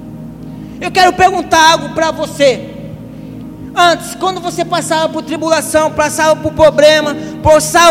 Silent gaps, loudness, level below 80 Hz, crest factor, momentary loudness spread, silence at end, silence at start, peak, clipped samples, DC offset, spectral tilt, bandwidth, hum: none; -11 LUFS; -38 dBFS; 12 dB; 21 LU; 0 s; 0 s; 0 dBFS; 0.6%; under 0.1%; -3 dB/octave; 16.5 kHz; none